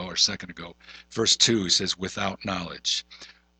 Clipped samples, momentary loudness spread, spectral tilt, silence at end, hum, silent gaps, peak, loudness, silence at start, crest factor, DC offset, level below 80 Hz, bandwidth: under 0.1%; 18 LU; -2 dB/octave; 0.3 s; none; none; -6 dBFS; -23 LUFS; 0 s; 22 dB; under 0.1%; -56 dBFS; 9.4 kHz